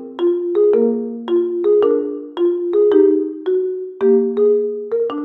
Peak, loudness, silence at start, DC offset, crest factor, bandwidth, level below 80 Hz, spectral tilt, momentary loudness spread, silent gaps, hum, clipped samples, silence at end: -2 dBFS; -17 LUFS; 0 s; under 0.1%; 14 dB; 4 kHz; -74 dBFS; -9 dB/octave; 7 LU; none; none; under 0.1%; 0 s